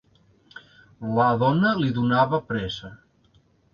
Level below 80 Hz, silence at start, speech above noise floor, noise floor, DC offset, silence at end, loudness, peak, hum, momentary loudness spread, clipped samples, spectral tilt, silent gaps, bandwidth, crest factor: -54 dBFS; 0.55 s; 39 dB; -61 dBFS; under 0.1%; 0.8 s; -22 LUFS; -8 dBFS; none; 15 LU; under 0.1%; -8 dB/octave; none; 7 kHz; 18 dB